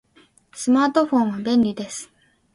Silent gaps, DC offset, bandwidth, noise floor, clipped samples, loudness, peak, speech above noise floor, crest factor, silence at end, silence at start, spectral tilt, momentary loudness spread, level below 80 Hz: none; under 0.1%; 11.5 kHz; -56 dBFS; under 0.1%; -20 LUFS; -4 dBFS; 37 dB; 18 dB; 0.5 s; 0.55 s; -5 dB/octave; 14 LU; -62 dBFS